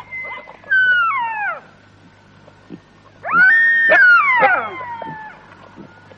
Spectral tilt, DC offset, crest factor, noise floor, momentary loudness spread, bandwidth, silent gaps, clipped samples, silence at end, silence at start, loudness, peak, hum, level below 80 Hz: -4.5 dB/octave; under 0.1%; 16 dB; -47 dBFS; 22 LU; 6.6 kHz; none; under 0.1%; 0.35 s; 0.1 s; -12 LUFS; -2 dBFS; none; -62 dBFS